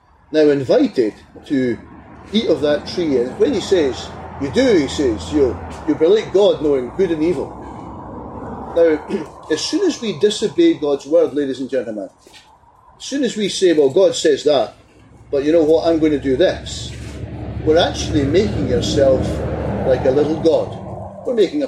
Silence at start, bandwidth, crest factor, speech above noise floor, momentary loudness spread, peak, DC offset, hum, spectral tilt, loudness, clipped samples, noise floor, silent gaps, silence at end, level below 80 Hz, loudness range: 0.3 s; 12 kHz; 14 dB; 32 dB; 15 LU; -4 dBFS; under 0.1%; none; -5.5 dB/octave; -17 LUFS; under 0.1%; -48 dBFS; none; 0 s; -38 dBFS; 3 LU